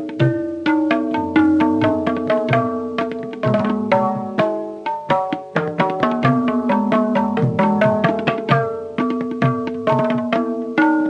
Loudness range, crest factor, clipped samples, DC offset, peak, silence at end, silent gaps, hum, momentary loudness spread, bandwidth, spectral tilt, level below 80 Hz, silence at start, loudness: 2 LU; 14 dB; under 0.1%; under 0.1%; -4 dBFS; 0 s; none; none; 6 LU; 8.6 kHz; -8 dB/octave; -56 dBFS; 0 s; -19 LUFS